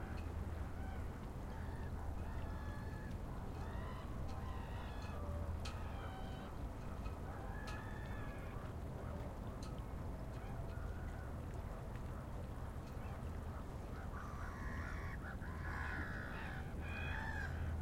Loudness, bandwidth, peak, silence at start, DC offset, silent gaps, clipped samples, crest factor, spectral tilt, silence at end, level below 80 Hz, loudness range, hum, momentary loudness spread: -47 LUFS; 16 kHz; -30 dBFS; 0 s; under 0.1%; none; under 0.1%; 14 dB; -6.5 dB/octave; 0 s; -50 dBFS; 2 LU; none; 5 LU